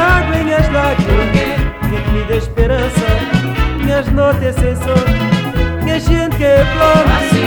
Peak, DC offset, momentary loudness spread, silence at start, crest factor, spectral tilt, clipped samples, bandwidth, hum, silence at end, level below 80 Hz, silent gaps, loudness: 0 dBFS; under 0.1%; 6 LU; 0 s; 12 dB; -6.5 dB/octave; under 0.1%; over 20 kHz; none; 0 s; -18 dBFS; none; -13 LUFS